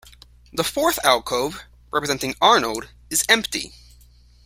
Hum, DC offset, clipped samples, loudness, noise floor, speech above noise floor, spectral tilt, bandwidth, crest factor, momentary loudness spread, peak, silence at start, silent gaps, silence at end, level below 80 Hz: 60 Hz at -50 dBFS; under 0.1%; under 0.1%; -20 LUFS; -51 dBFS; 30 dB; -1.5 dB/octave; 16.5 kHz; 22 dB; 14 LU; 0 dBFS; 0.55 s; none; 0.75 s; -50 dBFS